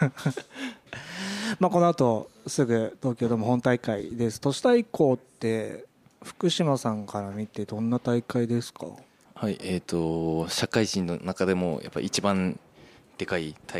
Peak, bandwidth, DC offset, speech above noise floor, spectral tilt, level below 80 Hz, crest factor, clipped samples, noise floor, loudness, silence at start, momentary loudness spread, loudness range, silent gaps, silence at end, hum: -8 dBFS; 15 kHz; under 0.1%; 27 dB; -5.5 dB/octave; -60 dBFS; 20 dB; under 0.1%; -54 dBFS; -27 LUFS; 0 s; 15 LU; 4 LU; none; 0 s; none